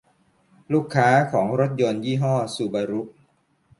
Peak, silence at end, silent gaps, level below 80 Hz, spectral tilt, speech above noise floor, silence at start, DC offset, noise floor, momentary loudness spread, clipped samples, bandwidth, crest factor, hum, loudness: -4 dBFS; 0.7 s; none; -64 dBFS; -6.5 dB/octave; 42 dB; 0.7 s; under 0.1%; -63 dBFS; 9 LU; under 0.1%; 11.5 kHz; 20 dB; none; -22 LUFS